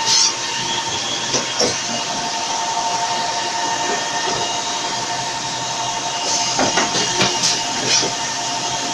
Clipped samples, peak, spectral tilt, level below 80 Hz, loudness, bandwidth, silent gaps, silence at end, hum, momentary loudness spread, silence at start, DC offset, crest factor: under 0.1%; -2 dBFS; -1 dB/octave; -56 dBFS; -18 LUFS; 12.5 kHz; none; 0 s; none; 5 LU; 0 s; under 0.1%; 18 dB